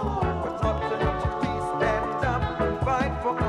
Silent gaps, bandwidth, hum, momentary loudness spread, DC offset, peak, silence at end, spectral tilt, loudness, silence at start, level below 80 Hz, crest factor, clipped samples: none; 11.5 kHz; none; 2 LU; under 0.1%; -10 dBFS; 0 s; -7 dB/octave; -26 LUFS; 0 s; -36 dBFS; 14 dB; under 0.1%